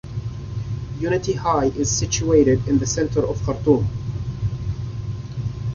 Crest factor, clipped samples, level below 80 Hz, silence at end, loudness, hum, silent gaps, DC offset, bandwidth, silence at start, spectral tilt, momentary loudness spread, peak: 18 dB; under 0.1%; -36 dBFS; 0 s; -22 LUFS; none; none; under 0.1%; 7.2 kHz; 0.05 s; -5.5 dB/octave; 12 LU; -4 dBFS